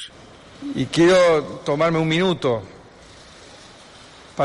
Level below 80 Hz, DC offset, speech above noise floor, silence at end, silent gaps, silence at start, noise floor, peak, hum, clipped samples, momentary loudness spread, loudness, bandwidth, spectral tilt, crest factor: -52 dBFS; under 0.1%; 26 dB; 0 s; none; 0 s; -45 dBFS; -6 dBFS; none; under 0.1%; 19 LU; -19 LUFS; 11.5 kHz; -5.5 dB/octave; 16 dB